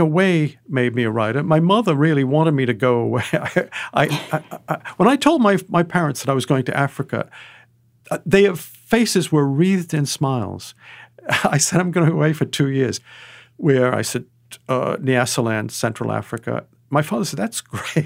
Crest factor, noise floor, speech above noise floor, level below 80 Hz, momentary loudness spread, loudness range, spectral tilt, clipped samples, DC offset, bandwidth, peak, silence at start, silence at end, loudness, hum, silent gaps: 18 dB; -53 dBFS; 35 dB; -58 dBFS; 11 LU; 3 LU; -5.5 dB/octave; under 0.1%; under 0.1%; 16 kHz; -2 dBFS; 0 s; 0 s; -19 LUFS; none; none